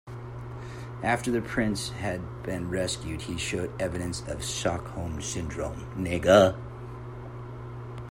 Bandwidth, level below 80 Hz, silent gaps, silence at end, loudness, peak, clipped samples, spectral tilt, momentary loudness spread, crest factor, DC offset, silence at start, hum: 16 kHz; -48 dBFS; none; 0 s; -28 LUFS; -6 dBFS; under 0.1%; -5 dB/octave; 16 LU; 22 dB; under 0.1%; 0.05 s; none